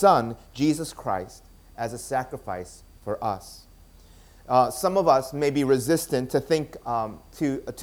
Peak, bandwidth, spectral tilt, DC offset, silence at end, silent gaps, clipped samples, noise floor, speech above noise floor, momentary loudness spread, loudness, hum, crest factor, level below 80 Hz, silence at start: -4 dBFS; 20 kHz; -5.5 dB/octave; under 0.1%; 0 s; none; under 0.1%; -51 dBFS; 26 dB; 14 LU; -26 LUFS; none; 20 dB; -52 dBFS; 0 s